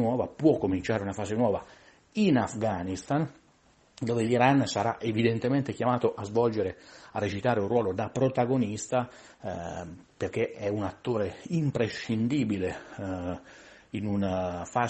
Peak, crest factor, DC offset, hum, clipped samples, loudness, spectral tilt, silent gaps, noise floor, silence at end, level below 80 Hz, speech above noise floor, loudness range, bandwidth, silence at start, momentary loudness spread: -10 dBFS; 20 dB; under 0.1%; none; under 0.1%; -29 LUFS; -6.5 dB/octave; none; -62 dBFS; 0 s; -60 dBFS; 34 dB; 4 LU; 8.4 kHz; 0 s; 12 LU